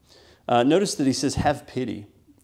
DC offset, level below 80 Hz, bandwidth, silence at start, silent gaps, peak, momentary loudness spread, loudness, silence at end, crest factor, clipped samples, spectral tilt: under 0.1%; -48 dBFS; 15 kHz; 0.5 s; none; -6 dBFS; 14 LU; -23 LUFS; 0.4 s; 18 dB; under 0.1%; -5 dB/octave